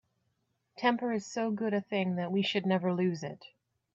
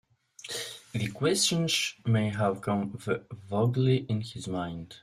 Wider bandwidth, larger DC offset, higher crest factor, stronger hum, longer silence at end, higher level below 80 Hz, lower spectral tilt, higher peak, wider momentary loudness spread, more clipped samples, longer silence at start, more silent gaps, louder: second, 7.8 kHz vs 15.5 kHz; neither; about the same, 18 dB vs 16 dB; neither; first, 0.5 s vs 0.05 s; second, -78 dBFS vs -62 dBFS; first, -6 dB/octave vs -4.5 dB/octave; about the same, -14 dBFS vs -14 dBFS; second, 6 LU vs 11 LU; neither; first, 0.75 s vs 0.45 s; neither; second, -32 LUFS vs -29 LUFS